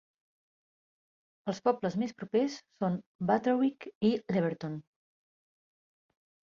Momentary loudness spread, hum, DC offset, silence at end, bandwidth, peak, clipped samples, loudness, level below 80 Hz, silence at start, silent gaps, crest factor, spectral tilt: 10 LU; none; under 0.1%; 1.75 s; 7.4 kHz; -12 dBFS; under 0.1%; -32 LUFS; -74 dBFS; 1.45 s; 3.06-3.19 s, 3.95-4.01 s; 22 dB; -7 dB/octave